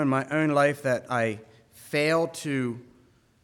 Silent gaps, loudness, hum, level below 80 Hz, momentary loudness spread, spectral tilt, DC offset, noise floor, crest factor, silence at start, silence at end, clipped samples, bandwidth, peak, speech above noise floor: none; -26 LUFS; none; -72 dBFS; 9 LU; -6 dB/octave; under 0.1%; -60 dBFS; 18 dB; 0 s; 0.6 s; under 0.1%; 18 kHz; -10 dBFS; 35 dB